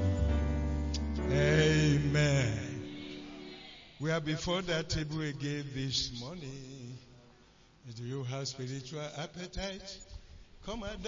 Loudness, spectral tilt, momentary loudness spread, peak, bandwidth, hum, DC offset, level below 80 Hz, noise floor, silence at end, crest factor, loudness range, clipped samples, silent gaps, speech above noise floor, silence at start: -33 LUFS; -5.5 dB/octave; 20 LU; -16 dBFS; 7.6 kHz; none; under 0.1%; -44 dBFS; -61 dBFS; 0 s; 18 dB; 11 LU; under 0.1%; none; 24 dB; 0 s